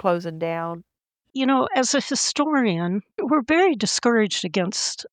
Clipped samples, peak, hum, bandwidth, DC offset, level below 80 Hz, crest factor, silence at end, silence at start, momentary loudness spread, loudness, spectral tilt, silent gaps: under 0.1%; -6 dBFS; none; 9.8 kHz; under 0.1%; -66 dBFS; 16 dB; 0.05 s; 0.05 s; 8 LU; -22 LUFS; -3.5 dB/octave; none